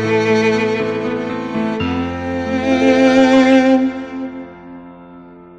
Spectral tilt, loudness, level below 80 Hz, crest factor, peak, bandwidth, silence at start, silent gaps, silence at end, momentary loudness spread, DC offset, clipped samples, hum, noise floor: -6 dB/octave; -15 LUFS; -46 dBFS; 16 dB; 0 dBFS; 8.8 kHz; 0 s; none; 0.05 s; 17 LU; under 0.1%; under 0.1%; none; -38 dBFS